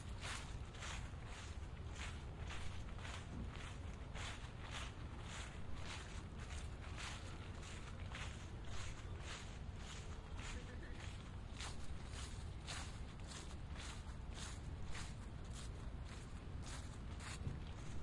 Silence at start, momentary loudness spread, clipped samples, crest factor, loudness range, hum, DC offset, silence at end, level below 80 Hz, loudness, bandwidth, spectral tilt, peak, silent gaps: 0 s; 3 LU; under 0.1%; 18 dB; 1 LU; none; under 0.1%; 0 s; -52 dBFS; -51 LUFS; 11.5 kHz; -4 dB/octave; -32 dBFS; none